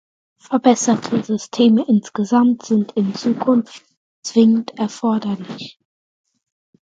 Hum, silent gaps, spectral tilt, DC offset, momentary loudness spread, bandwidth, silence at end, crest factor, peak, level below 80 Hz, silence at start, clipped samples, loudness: none; 3.97-4.23 s; -5.5 dB/octave; under 0.1%; 12 LU; 9 kHz; 1.15 s; 18 dB; 0 dBFS; -64 dBFS; 0.5 s; under 0.1%; -17 LUFS